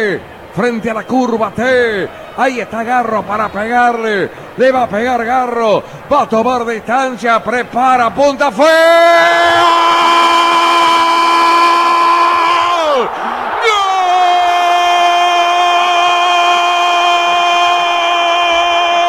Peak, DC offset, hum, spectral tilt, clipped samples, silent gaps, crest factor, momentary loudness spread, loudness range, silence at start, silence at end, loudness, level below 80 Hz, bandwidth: -2 dBFS; under 0.1%; none; -3 dB/octave; under 0.1%; none; 10 dB; 8 LU; 6 LU; 0 s; 0 s; -11 LUFS; -50 dBFS; 14.5 kHz